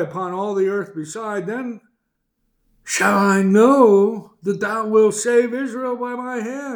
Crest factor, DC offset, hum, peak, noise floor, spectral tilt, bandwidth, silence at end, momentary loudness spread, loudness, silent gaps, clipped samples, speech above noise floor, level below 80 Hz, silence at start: 18 dB; under 0.1%; none; -2 dBFS; -72 dBFS; -5.5 dB/octave; over 20 kHz; 0 s; 14 LU; -18 LUFS; none; under 0.1%; 54 dB; -66 dBFS; 0 s